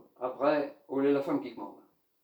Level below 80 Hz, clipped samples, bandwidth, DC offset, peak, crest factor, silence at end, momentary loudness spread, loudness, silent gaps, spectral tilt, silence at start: -84 dBFS; under 0.1%; over 20 kHz; under 0.1%; -14 dBFS; 18 dB; 0.45 s; 15 LU; -31 LUFS; none; -7.5 dB/octave; 0.2 s